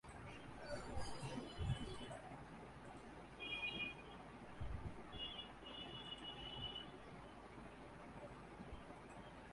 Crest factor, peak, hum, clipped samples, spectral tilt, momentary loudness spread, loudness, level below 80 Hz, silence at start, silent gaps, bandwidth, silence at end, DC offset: 20 dB; -32 dBFS; none; under 0.1%; -5 dB/octave; 11 LU; -51 LUFS; -60 dBFS; 0.05 s; none; 11.5 kHz; 0 s; under 0.1%